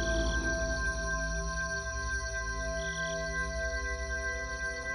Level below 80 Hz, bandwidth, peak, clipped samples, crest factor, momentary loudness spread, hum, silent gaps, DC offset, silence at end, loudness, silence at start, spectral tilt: -38 dBFS; 10.5 kHz; -18 dBFS; under 0.1%; 14 dB; 4 LU; none; none; under 0.1%; 0 s; -34 LUFS; 0 s; -3.5 dB/octave